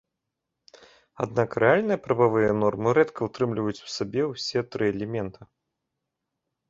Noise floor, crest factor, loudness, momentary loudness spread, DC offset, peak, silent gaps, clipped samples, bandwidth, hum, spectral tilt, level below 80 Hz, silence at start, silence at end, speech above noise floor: -83 dBFS; 22 dB; -25 LUFS; 10 LU; under 0.1%; -4 dBFS; none; under 0.1%; 7.8 kHz; none; -6 dB/octave; -60 dBFS; 1.2 s; 1.25 s; 59 dB